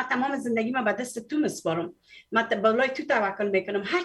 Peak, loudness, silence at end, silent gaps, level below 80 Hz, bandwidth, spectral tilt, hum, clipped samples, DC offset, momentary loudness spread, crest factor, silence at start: -8 dBFS; -26 LUFS; 0 s; none; -72 dBFS; 12.5 kHz; -4.5 dB/octave; none; under 0.1%; under 0.1%; 7 LU; 18 dB; 0 s